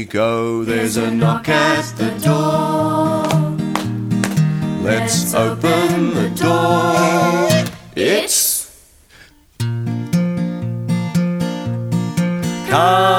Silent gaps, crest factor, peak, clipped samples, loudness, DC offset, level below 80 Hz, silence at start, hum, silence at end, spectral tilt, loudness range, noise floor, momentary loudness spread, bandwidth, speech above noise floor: none; 16 dB; 0 dBFS; under 0.1%; -17 LUFS; under 0.1%; -50 dBFS; 0 s; none; 0 s; -5 dB/octave; 5 LU; -46 dBFS; 8 LU; 17 kHz; 31 dB